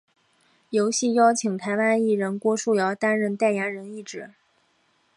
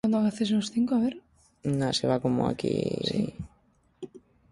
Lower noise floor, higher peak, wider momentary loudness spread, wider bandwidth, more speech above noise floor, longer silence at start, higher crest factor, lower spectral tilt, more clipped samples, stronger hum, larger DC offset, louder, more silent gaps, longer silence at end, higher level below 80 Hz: about the same, -66 dBFS vs -65 dBFS; first, -6 dBFS vs -12 dBFS; second, 16 LU vs 19 LU; about the same, 11.5 kHz vs 11.5 kHz; first, 43 dB vs 38 dB; first, 0.7 s vs 0.05 s; about the same, 18 dB vs 16 dB; second, -4.5 dB/octave vs -6 dB/octave; neither; neither; neither; first, -23 LUFS vs -28 LUFS; neither; first, 0.9 s vs 0.35 s; second, -76 dBFS vs -56 dBFS